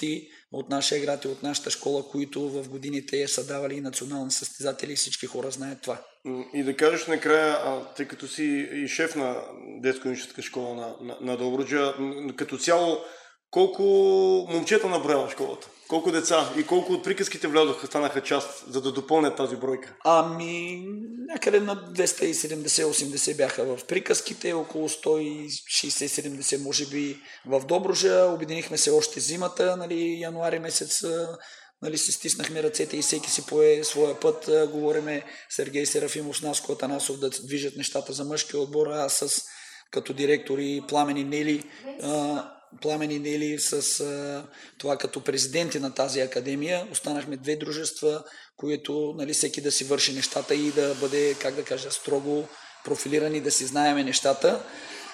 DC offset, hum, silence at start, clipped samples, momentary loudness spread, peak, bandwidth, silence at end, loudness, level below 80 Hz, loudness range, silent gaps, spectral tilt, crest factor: under 0.1%; none; 0 s; under 0.1%; 12 LU; -6 dBFS; 15.5 kHz; 0 s; -26 LUFS; -78 dBFS; 5 LU; none; -2.5 dB/octave; 20 dB